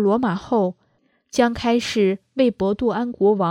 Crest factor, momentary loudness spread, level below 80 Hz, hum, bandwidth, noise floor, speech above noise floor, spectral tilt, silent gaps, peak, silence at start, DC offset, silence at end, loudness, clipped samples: 18 dB; 3 LU; -50 dBFS; none; 13.5 kHz; -64 dBFS; 45 dB; -6 dB/octave; none; -2 dBFS; 0 s; under 0.1%; 0 s; -21 LUFS; under 0.1%